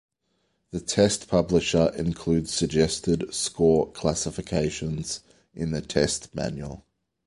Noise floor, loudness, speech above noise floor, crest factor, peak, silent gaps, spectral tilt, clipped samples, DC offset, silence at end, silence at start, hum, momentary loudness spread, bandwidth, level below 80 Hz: -73 dBFS; -25 LUFS; 48 dB; 20 dB; -6 dBFS; none; -5 dB/octave; under 0.1%; under 0.1%; 0.5 s; 0.75 s; none; 12 LU; 11.5 kHz; -46 dBFS